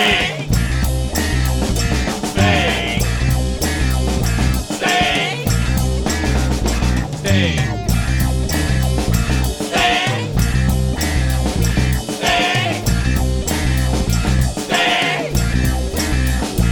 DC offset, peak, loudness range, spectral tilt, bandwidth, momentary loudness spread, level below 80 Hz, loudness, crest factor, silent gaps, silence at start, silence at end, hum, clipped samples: under 0.1%; -2 dBFS; 1 LU; -4.5 dB/octave; 18.5 kHz; 4 LU; -22 dBFS; -17 LUFS; 14 dB; none; 0 s; 0 s; none; under 0.1%